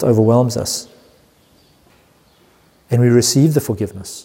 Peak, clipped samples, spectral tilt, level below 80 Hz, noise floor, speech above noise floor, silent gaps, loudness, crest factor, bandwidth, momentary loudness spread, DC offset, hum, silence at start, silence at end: -2 dBFS; under 0.1%; -5.5 dB/octave; -52 dBFS; -53 dBFS; 38 dB; none; -15 LUFS; 16 dB; 16.5 kHz; 11 LU; under 0.1%; none; 0 s; 0.05 s